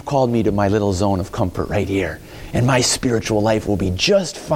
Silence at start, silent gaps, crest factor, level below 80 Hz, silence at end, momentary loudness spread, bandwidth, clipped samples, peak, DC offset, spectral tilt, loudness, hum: 0.05 s; none; 14 dB; -38 dBFS; 0 s; 7 LU; 16.5 kHz; under 0.1%; -4 dBFS; under 0.1%; -5 dB/octave; -18 LUFS; none